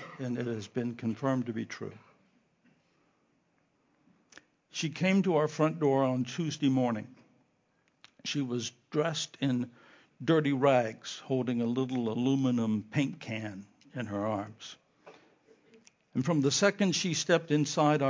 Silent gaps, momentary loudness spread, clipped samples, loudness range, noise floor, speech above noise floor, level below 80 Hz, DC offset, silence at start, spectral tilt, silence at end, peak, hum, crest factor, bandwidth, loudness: none; 14 LU; under 0.1%; 9 LU; -73 dBFS; 43 dB; -74 dBFS; under 0.1%; 0 s; -5.5 dB/octave; 0 s; -10 dBFS; none; 20 dB; 7.6 kHz; -31 LUFS